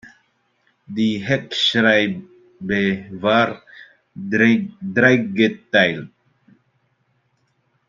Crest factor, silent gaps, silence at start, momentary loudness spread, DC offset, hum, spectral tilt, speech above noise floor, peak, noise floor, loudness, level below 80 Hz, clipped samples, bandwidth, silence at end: 20 dB; none; 0.05 s; 16 LU; under 0.1%; none; -5.5 dB/octave; 48 dB; -2 dBFS; -66 dBFS; -18 LUFS; -62 dBFS; under 0.1%; 7.6 kHz; 1.8 s